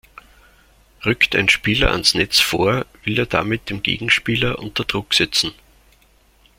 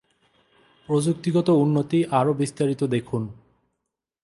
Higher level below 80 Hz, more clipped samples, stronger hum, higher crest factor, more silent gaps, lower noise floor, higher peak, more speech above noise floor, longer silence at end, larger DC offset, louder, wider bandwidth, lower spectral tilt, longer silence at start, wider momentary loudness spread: first, -38 dBFS vs -62 dBFS; neither; neither; about the same, 20 dB vs 16 dB; neither; second, -55 dBFS vs -81 dBFS; first, 0 dBFS vs -8 dBFS; second, 36 dB vs 60 dB; first, 1.05 s vs 0.9 s; neither; first, -17 LUFS vs -23 LUFS; first, 16.5 kHz vs 11.5 kHz; second, -3.5 dB/octave vs -7 dB/octave; about the same, 1 s vs 0.9 s; about the same, 8 LU vs 8 LU